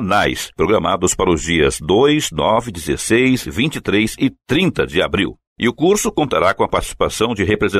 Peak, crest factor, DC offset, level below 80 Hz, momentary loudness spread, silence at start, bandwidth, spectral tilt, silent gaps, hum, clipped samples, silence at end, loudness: -4 dBFS; 14 dB; under 0.1%; -36 dBFS; 6 LU; 0 s; 15 kHz; -4.5 dB/octave; 5.47-5.56 s; none; under 0.1%; 0 s; -16 LUFS